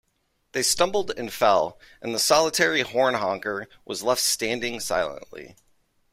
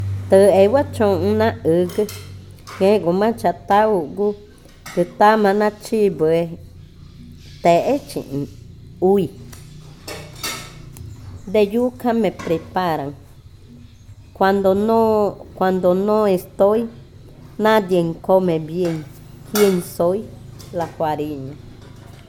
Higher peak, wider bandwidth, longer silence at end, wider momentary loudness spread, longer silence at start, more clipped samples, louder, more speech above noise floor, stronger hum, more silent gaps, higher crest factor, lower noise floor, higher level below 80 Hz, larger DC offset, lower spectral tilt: second, -4 dBFS vs 0 dBFS; second, 16 kHz vs 18 kHz; first, 0.6 s vs 0.3 s; second, 14 LU vs 21 LU; first, 0.55 s vs 0 s; neither; second, -23 LUFS vs -18 LUFS; first, 47 dB vs 25 dB; neither; neither; about the same, 20 dB vs 18 dB; first, -71 dBFS vs -42 dBFS; second, -58 dBFS vs -48 dBFS; neither; second, -2 dB/octave vs -6 dB/octave